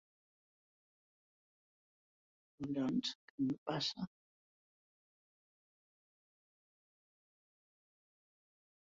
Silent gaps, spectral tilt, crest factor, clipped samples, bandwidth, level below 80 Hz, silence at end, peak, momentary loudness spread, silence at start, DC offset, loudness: 3.15-3.38 s, 3.58-3.66 s; -4.5 dB/octave; 22 dB; under 0.1%; 7 kHz; -82 dBFS; 4.85 s; -26 dBFS; 11 LU; 2.6 s; under 0.1%; -40 LUFS